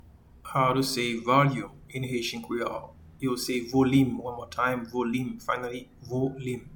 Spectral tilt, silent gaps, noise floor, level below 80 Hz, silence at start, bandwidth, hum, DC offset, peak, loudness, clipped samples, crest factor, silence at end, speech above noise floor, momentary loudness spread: -5.5 dB/octave; none; -48 dBFS; -56 dBFS; 0.05 s; 19 kHz; none; under 0.1%; -8 dBFS; -28 LUFS; under 0.1%; 20 dB; 0 s; 21 dB; 13 LU